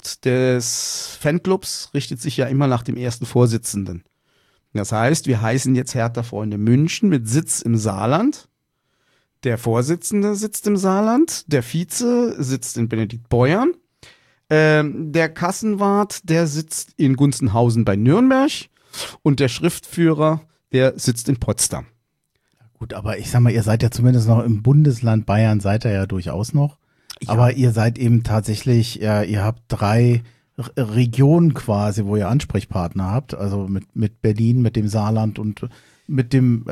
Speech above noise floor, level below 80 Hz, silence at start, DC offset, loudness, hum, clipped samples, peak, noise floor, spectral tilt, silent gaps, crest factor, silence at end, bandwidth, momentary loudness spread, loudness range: 52 dB; -46 dBFS; 0.05 s; under 0.1%; -19 LUFS; none; under 0.1%; -4 dBFS; -70 dBFS; -6 dB/octave; none; 14 dB; 0 s; 14.5 kHz; 9 LU; 3 LU